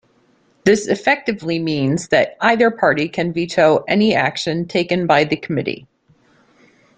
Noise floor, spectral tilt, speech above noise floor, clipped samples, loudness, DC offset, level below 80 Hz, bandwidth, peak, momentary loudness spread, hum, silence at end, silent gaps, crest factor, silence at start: -57 dBFS; -5.5 dB/octave; 41 dB; under 0.1%; -17 LUFS; under 0.1%; -56 dBFS; 9.4 kHz; -2 dBFS; 7 LU; none; 1.2 s; none; 16 dB; 0.65 s